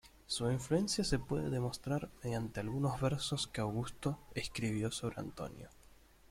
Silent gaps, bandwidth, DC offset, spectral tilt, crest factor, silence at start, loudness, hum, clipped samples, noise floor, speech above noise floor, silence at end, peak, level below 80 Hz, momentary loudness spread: none; 16 kHz; under 0.1%; -5 dB/octave; 20 dB; 0.05 s; -38 LUFS; none; under 0.1%; -62 dBFS; 25 dB; 0.35 s; -18 dBFS; -56 dBFS; 9 LU